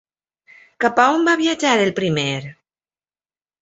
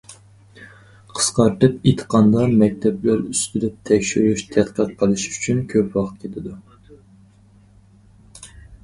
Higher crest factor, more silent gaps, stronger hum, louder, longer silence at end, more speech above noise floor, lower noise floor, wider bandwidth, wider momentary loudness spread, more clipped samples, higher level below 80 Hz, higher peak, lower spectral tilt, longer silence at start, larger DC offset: about the same, 18 dB vs 20 dB; neither; neither; about the same, -17 LUFS vs -19 LUFS; first, 1.1 s vs 0.1 s; first, over 73 dB vs 32 dB; first, under -90 dBFS vs -51 dBFS; second, 8 kHz vs 11.5 kHz; second, 9 LU vs 16 LU; neither; second, -62 dBFS vs -48 dBFS; about the same, -2 dBFS vs 0 dBFS; about the same, -4.5 dB/octave vs -5.5 dB/octave; first, 0.8 s vs 0.1 s; neither